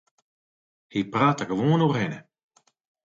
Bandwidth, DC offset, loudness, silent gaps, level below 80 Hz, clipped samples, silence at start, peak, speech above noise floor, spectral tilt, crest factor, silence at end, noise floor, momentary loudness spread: 7.6 kHz; under 0.1%; -24 LUFS; none; -66 dBFS; under 0.1%; 0.95 s; -8 dBFS; over 67 dB; -7 dB/octave; 18 dB; 0.85 s; under -90 dBFS; 11 LU